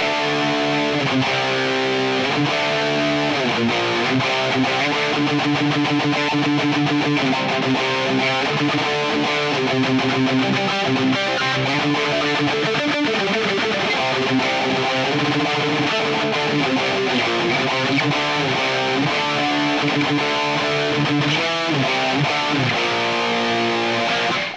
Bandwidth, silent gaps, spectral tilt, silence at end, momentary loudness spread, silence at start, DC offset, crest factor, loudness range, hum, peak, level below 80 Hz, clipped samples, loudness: 9.8 kHz; none; -4.5 dB/octave; 0 s; 1 LU; 0 s; under 0.1%; 12 dB; 0 LU; none; -8 dBFS; -58 dBFS; under 0.1%; -19 LUFS